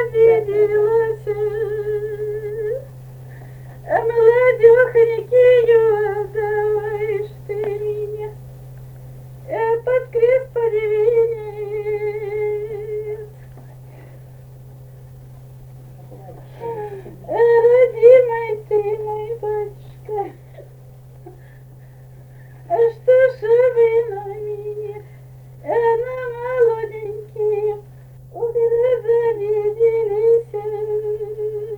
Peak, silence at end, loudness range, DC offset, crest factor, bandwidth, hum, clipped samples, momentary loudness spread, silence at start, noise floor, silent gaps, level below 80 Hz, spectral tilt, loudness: 0 dBFS; 0 s; 14 LU; under 0.1%; 18 dB; 4.4 kHz; none; under 0.1%; 22 LU; 0 s; -41 dBFS; none; -50 dBFS; -7.5 dB/octave; -18 LUFS